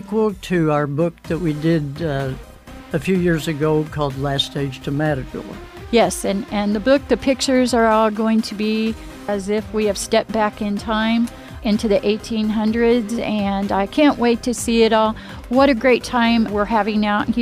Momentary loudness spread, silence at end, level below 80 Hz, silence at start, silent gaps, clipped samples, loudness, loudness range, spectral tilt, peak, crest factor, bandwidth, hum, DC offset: 9 LU; 0 s; -40 dBFS; 0 s; none; under 0.1%; -19 LUFS; 4 LU; -5.5 dB/octave; -4 dBFS; 14 dB; 15.5 kHz; none; under 0.1%